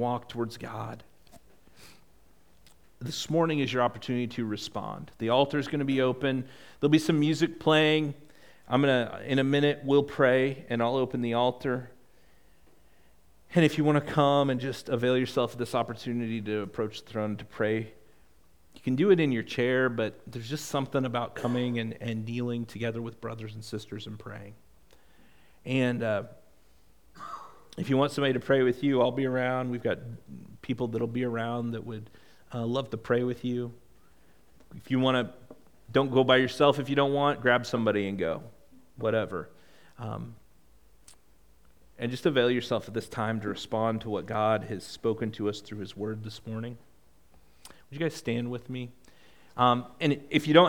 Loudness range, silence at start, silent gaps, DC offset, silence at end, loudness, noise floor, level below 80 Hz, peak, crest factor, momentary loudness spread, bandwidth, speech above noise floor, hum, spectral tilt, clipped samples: 10 LU; 0 s; none; 0.2%; 0 s; -28 LUFS; -63 dBFS; -64 dBFS; -6 dBFS; 24 dB; 15 LU; 18 kHz; 35 dB; none; -6 dB/octave; under 0.1%